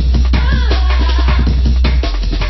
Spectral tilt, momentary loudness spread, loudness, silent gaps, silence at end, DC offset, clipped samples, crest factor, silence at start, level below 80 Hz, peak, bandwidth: -6.5 dB/octave; 2 LU; -14 LUFS; none; 0 s; under 0.1%; under 0.1%; 10 dB; 0 s; -12 dBFS; 0 dBFS; 6 kHz